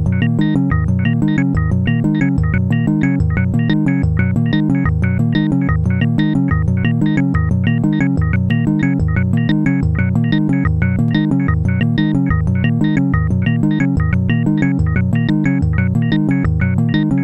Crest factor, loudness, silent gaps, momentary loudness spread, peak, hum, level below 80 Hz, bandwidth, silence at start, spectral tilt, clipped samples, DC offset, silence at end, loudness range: 14 dB; -15 LUFS; none; 1 LU; 0 dBFS; none; -28 dBFS; 8.2 kHz; 0 s; -9 dB/octave; under 0.1%; under 0.1%; 0 s; 0 LU